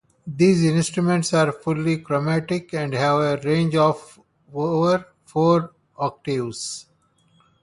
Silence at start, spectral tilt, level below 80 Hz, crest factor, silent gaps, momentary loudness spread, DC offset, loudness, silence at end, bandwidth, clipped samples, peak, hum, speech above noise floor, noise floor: 0.25 s; -6 dB/octave; -60 dBFS; 16 dB; none; 11 LU; under 0.1%; -21 LUFS; 0.8 s; 11.5 kHz; under 0.1%; -4 dBFS; none; 41 dB; -61 dBFS